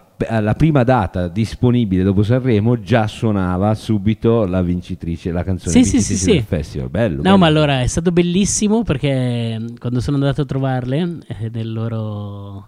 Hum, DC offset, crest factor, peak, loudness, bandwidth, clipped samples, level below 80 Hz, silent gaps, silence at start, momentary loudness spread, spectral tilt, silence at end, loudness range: none; under 0.1%; 16 dB; 0 dBFS; -17 LUFS; 12.5 kHz; under 0.1%; -36 dBFS; none; 0.2 s; 10 LU; -6 dB/octave; 0.05 s; 4 LU